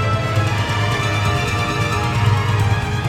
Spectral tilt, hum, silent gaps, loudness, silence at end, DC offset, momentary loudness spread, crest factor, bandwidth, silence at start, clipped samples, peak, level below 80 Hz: -5.5 dB/octave; none; none; -18 LUFS; 0 s; under 0.1%; 2 LU; 14 dB; 14.5 kHz; 0 s; under 0.1%; -4 dBFS; -34 dBFS